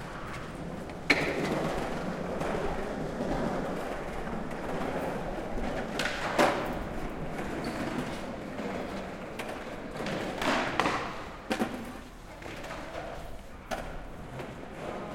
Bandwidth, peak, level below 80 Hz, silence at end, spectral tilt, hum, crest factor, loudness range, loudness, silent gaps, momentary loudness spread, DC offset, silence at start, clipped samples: 16.5 kHz; -6 dBFS; -46 dBFS; 0 s; -5 dB/octave; none; 28 dB; 6 LU; -34 LUFS; none; 14 LU; under 0.1%; 0 s; under 0.1%